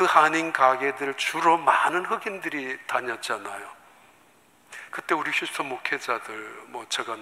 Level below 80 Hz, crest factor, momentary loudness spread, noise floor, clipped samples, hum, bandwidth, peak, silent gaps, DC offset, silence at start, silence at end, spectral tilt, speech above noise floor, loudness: -80 dBFS; 24 dB; 17 LU; -58 dBFS; under 0.1%; none; 16 kHz; -2 dBFS; none; under 0.1%; 0 s; 0 s; -2.5 dB/octave; 33 dB; -25 LUFS